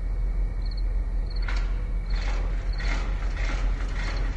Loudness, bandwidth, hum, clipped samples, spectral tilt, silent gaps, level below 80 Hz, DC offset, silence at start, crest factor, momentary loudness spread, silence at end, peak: -31 LUFS; 7.6 kHz; none; under 0.1%; -5.5 dB/octave; none; -26 dBFS; under 0.1%; 0 s; 10 dB; 2 LU; 0 s; -16 dBFS